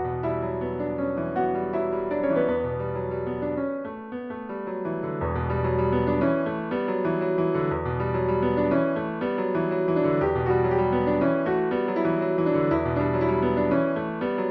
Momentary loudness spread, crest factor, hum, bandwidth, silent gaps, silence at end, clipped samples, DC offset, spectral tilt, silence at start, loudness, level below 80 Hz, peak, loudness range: 7 LU; 16 dB; none; 5 kHz; none; 0 s; under 0.1%; under 0.1%; -11 dB/octave; 0 s; -25 LUFS; -46 dBFS; -10 dBFS; 5 LU